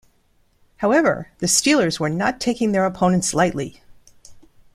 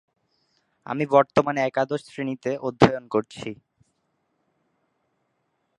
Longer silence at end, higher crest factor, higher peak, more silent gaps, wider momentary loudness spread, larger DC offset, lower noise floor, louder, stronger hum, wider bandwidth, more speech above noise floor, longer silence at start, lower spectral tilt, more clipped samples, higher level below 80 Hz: second, 0.35 s vs 2.25 s; second, 18 dB vs 26 dB; about the same, -4 dBFS vs -2 dBFS; neither; second, 8 LU vs 15 LU; neither; second, -60 dBFS vs -73 dBFS; first, -19 LUFS vs -23 LUFS; neither; first, 15 kHz vs 11 kHz; second, 41 dB vs 50 dB; about the same, 0.8 s vs 0.9 s; second, -4 dB/octave vs -6.5 dB/octave; neither; first, -52 dBFS vs -58 dBFS